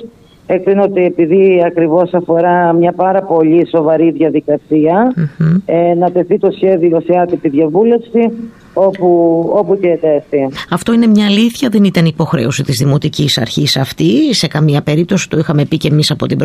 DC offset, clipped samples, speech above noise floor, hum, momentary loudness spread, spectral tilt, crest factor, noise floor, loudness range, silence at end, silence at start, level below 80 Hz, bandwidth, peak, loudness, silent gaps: under 0.1%; under 0.1%; 22 dB; none; 4 LU; -6.5 dB/octave; 10 dB; -33 dBFS; 2 LU; 0 s; 0 s; -48 dBFS; 15 kHz; 0 dBFS; -11 LUFS; none